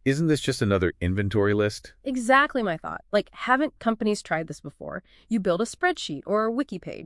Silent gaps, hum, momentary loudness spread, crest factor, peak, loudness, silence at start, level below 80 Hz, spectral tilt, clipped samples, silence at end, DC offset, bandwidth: none; none; 12 LU; 20 dB; -6 dBFS; -25 LUFS; 0.05 s; -54 dBFS; -5.5 dB/octave; under 0.1%; 0 s; under 0.1%; 12 kHz